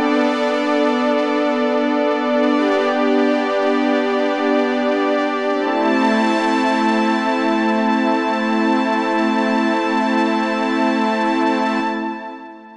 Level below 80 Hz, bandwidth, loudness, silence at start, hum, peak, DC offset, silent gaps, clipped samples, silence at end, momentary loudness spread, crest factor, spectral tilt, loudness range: -68 dBFS; 10 kHz; -17 LUFS; 0 s; none; -6 dBFS; 0.1%; none; under 0.1%; 0 s; 2 LU; 12 dB; -5 dB/octave; 1 LU